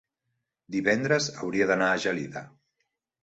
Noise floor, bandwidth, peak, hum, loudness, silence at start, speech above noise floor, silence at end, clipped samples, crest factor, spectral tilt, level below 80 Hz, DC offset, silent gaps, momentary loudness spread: -81 dBFS; 8.2 kHz; -8 dBFS; none; -26 LUFS; 0.7 s; 55 dB; 0.75 s; under 0.1%; 20 dB; -4.5 dB/octave; -66 dBFS; under 0.1%; none; 11 LU